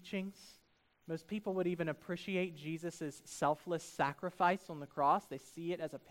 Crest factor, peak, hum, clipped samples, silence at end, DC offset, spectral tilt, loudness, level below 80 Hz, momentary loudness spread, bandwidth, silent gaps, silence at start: 20 dB; -20 dBFS; none; under 0.1%; 0 s; under 0.1%; -5.5 dB/octave; -38 LUFS; -76 dBFS; 12 LU; 16 kHz; none; 0 s